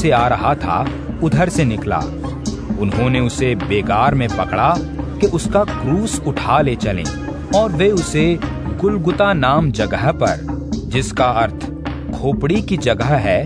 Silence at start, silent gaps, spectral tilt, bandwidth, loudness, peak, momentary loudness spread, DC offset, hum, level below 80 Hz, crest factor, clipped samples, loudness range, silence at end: 0 s; none; -6 dB/octave; 11 kHz; -17 LUFS; 0 dBFS; 9 LU; 0.1%; none; -30 dBFS; 16 dB; under 0.1%; 2 LU; 0 s